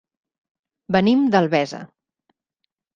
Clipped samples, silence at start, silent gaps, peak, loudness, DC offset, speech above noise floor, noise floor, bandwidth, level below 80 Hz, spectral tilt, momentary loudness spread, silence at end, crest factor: under 0.1%; 0.9 s; none; -2 dBFS; -19 LUFS; under 0.1%; 61 dB; -79 dBFS; 7.4 kHz; -60 dBFS; -6.5 dB/octave; 12 LU; 1.1 s; 20 dB